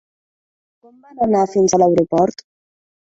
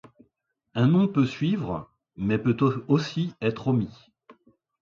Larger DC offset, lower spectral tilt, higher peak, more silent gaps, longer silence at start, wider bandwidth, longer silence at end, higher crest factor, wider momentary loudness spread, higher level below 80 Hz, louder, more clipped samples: neither; second, -5.5 dB/octave vs -8 dB/octave; first, -2 dBFS vs -8 dBFS; neither; first, 1.15 s vs 0.75 s; about the same, 8 kHz vs 7.4 kHz; first, 0.85 s vs 0.5 s; about the same, 16 dB vs 18 dB; second, 6 LU vs 11 LU; about the same, -54 dBFS vs -58 dBFS; first, -16 LUFS vs -25 LUFS; neither